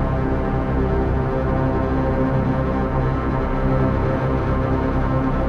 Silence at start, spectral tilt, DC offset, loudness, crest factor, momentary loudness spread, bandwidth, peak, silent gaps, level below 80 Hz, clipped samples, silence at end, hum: 0 s; -10 dB/octave; under 0.1%; -21 LUFS; 12 dB; 2 LU; 6.4 kHz; -6 dBFS; none; -26 dBFS; under 0.1%; 0 s; none